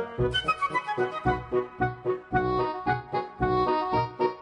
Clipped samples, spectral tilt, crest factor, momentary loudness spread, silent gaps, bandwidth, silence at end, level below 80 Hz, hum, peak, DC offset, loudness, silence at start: under 0.1%; -6.5 dB/octave; 16 dB; 4 LU; none; 10.5 kHz; 0 s; -46 dBFS; none; -12 dBFS; under 0.1%; -28 LUFS; 0 s